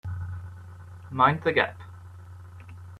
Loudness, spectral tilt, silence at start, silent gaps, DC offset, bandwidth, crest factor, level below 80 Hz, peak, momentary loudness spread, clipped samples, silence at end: -25 LUFS; -7 dB/octave; 0.05 s; none; under 0.1%; 12 kHz; 24 dB; -58 dBFS; -6 dBFS; 24 LU; under 0.1%; 0 s